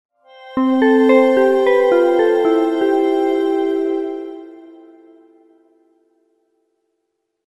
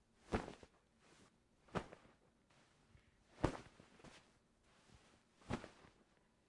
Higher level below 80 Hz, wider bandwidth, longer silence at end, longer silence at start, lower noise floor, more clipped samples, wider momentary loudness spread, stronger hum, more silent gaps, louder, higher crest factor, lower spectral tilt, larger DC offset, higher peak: about the same, -64 dBFS vs -62 dBFS; about the same, 12 kHz vs 11 kHz; first, 2.85 s vs 0.65 s; first, 0.4 s vs 0.25 s; about the same, -73 dBFS vs -75 dBFS; neither; second, 14 LU vs 25 LU; neither; neither; first, -15 LUFS vs -48 LUFS; second, 16 dB vs 30 dB; about the same, -5.5 dB/octave vs -6 dB/octave; neither; first, -2 dBFS vs -22 dBFS